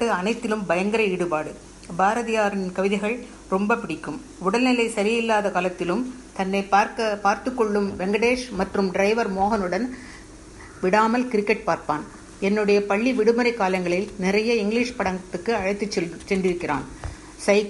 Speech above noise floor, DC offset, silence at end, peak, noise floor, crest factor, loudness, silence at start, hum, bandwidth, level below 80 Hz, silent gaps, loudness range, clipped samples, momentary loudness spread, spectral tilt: 20 dB; under 0.1%; 0 s; -6 dBFS; -42 dBFS; 18 dB; -23 LUFS; 0 s; none; 11.5 kHz; -50 dBFS; none; 2 LU; under 0.1%; 11 LU; -5 dB/octave